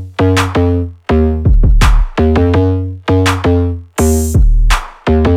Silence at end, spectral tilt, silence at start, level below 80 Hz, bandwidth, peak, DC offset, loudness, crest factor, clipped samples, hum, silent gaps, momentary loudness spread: 0 s; -6.5 dB/octave; 0 s; -14 dBFS; 15.5 kHz; 0 dBFS; under 0.1%; -13 LUFS; 10 dB; under 0.1%; none; none; 4 LU